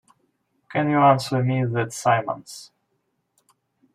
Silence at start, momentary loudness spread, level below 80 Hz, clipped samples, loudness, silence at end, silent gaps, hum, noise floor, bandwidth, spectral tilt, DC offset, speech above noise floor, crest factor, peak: 0.7 s; 16 LU; -66 dBFS; under 0.1%; -21 LUFS; 1.3 s; none; none; -73 dBFS; 14.5 kHz; -6 dB/octave; under 0.1%; 52 dB; 20 dB; -4 dBFS